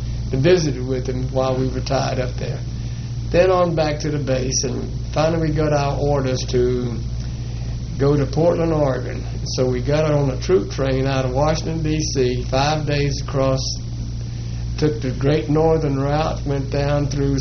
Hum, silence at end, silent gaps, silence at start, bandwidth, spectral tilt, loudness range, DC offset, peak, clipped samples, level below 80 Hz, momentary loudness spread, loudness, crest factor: none; 0 s; none; 0 s; 6.6 kHz; -6 dB/octave; 2 LU; under 0.1%; -2 dBFS; under 0.1%; -30 dBFS; 10 LU; -20 LUFS; 16 dB